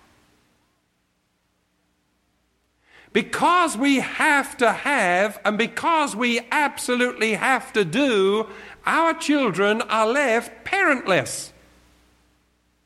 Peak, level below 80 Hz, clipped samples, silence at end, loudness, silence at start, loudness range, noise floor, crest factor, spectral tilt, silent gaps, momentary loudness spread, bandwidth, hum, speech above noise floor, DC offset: -4 dBFS; -62 dBFS; under 0.1%; 1.4 s; -21 LUFS; 3.15 s; 4 LU; -69 dBFS; 18 dB; -3.5 dB/octave; none; 6 LU; 14.5 kHz; 60 Hz at -55 dBFS; 48 dB; under 0.1%